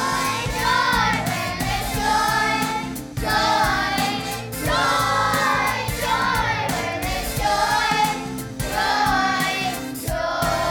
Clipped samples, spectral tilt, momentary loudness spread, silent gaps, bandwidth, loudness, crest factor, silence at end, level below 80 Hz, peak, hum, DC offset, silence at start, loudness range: under 0.1%; -3.5 dB/octave; 7 LU; none; 19.5 kHz; -21 LUFS; 16 dB; 0 s; -36 dBFS; -6 dBFS; none; under 0.1%; 0 s; 1 LU